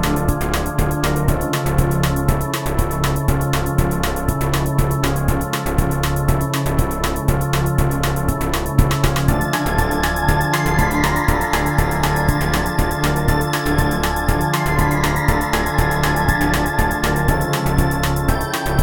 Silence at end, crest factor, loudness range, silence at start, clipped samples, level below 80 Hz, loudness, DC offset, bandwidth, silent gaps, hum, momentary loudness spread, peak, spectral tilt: 0 s; 18 dB; 2 LU; 0 s; under 0.1%; -24 dBFS; -18 LUFS; 2%; 19 kHz; none; none; 3 LU; 0 dBFS; -5.5 dB/octave